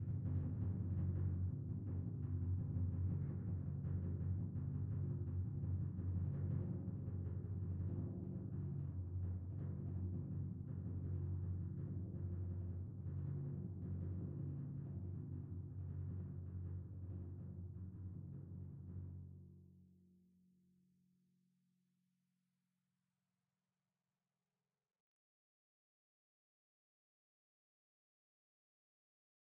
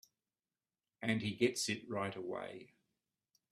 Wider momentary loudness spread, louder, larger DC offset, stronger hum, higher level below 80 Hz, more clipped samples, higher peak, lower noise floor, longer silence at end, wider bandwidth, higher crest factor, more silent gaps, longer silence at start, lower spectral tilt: second, 9 LU vs 12 LU; second, -46 LUFS vs -38 LUFS; neither; neither; first, -62 dBFS vs -78 dBFS; neither; second, -30 dBFS vs -18 dBFS; about the same, under -90 dBFS vs under -90 dBFS; first, 9.6 s vs 0.85 s; second, 2 kHz vs 15 kHz; second, 14 dB vs 24 dB; neither; second, 0 s vs 1 s; first, -13 dB/octave vs -4 dB/octave